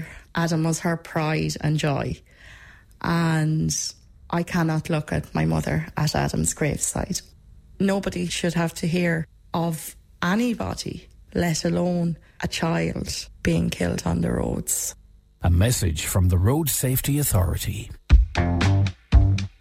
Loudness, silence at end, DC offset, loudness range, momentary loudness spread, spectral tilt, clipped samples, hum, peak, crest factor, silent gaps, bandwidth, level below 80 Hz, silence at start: -24 LUFS; 0.1 s; under 0.1%; 4 LU; 9 LU; -5 dB/octave; under 0.1%; none; -6 dBFS; 18 dB; none; 16 kHz; -32 dBFS; 0 s